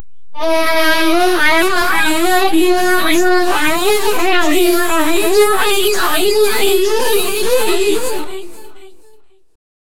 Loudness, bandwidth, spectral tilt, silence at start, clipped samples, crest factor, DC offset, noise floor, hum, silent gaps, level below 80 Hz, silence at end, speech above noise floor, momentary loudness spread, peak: -13 LUFS; 18.5 kHz; -2 dB/octave; 0 s; under 0.1%; 14 dB; 20%; -46 dBFS; none; none; -42 dBFS; 0.45 s; 33 dB; 4 LU; 0 dBFS